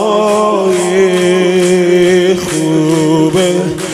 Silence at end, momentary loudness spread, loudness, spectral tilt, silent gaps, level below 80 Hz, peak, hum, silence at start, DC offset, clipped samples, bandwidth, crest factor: 0 s; 4 LU; -10 LUFS; -5 dB/octave; none; -48 dBFS; 0 dBFS; none; 0 s; under 0.1%; under 0.1%; 14.5 kHz; 10 dB